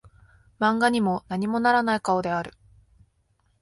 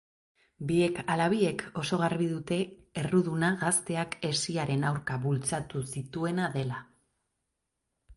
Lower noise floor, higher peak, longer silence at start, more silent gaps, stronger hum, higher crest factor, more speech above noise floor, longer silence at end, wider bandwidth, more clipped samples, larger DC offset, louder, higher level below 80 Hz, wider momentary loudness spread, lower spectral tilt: second, -68 dBFS vs -83 dBFS; first, -8 dBFS vs -14 dBFS; about the same, 0.6 s vs 0.6 s; neither; neither; about the same, 18 dB vs 18 dB; second, 44 dB vs 53 dB; first, 1.1 s vs 0.05 s; about the same, 11.5 kHz vs 11.5 kHz; neither; neither; first, -24 LUFS vs -30 LUFS; about the same, -58 dBFS vs -62 dBFS; about the same, 8 LU vs 9 LU; about the same, -5.5 dB/octave vs -5 dB/octave